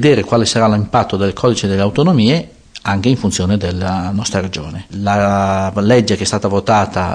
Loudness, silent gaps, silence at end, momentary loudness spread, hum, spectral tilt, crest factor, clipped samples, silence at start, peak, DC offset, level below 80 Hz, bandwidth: -15 LUFS; none; 0 s; 8 LU; none; -5.5 dB/octave; 12 dB; under 0.1%; 0 s; -2 dBFS; under 0.1%; -40 dBFS; 10.5 kHz